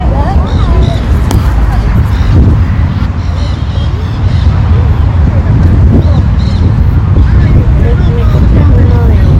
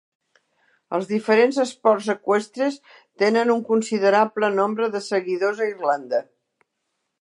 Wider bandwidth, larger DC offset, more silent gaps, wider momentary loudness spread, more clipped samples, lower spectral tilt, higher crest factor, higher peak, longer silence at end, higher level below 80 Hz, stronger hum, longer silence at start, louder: second, 8.4 kHz vs 11 kHz; neither; neither; about the same, 6 LU vs 8 LU; first, 1% vs under 0.1%; first, -8.5 dB/octave vs -5 dB/octave; second, 6 dB vs 18 dB; first, 0 dBFS vs -4 dBFS; second, 0 s vs 1 s; first, -10 dBFS vs -78 dBFS; neither; second, 0 s vs 0.9 s; first, -9 LUFS vs -21 LUFS